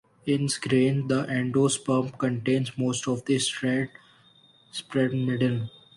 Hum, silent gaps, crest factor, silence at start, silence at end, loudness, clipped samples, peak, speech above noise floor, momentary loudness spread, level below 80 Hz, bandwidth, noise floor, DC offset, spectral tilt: none; none; 16 dB; 0.25 s; 0.25 s; -26 LUFS; under 0.1%; -12 dBFS; 33 dB; 6 LU; -64 dBFS; 11.5 kHz; -58 dBFS; under 0.1%; -5 dB/octave